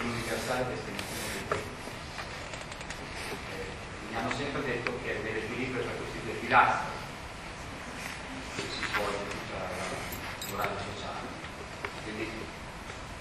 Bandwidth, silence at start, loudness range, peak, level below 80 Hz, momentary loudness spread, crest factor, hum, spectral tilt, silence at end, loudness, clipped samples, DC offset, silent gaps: 13 kHz; 0 s; 7 LU; -10 dBFS; -50 dBFS; 9 LU; 24 dB; none; -4 dB/octave; 0 s; -34 LUFS; under 0.1%; under 0.1%; none